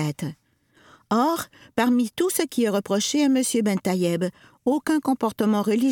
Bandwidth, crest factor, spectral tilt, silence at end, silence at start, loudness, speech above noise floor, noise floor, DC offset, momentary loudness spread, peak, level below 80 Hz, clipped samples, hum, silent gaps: 19 kHz; 14 dB; -5 dB/octave; 0 s; 0 s; -23 LUFS; 35 dB; -57 dBFS; under 0.1%; 9 LU; -8 dBFS; -66 dBFS; under 0.1%; none; none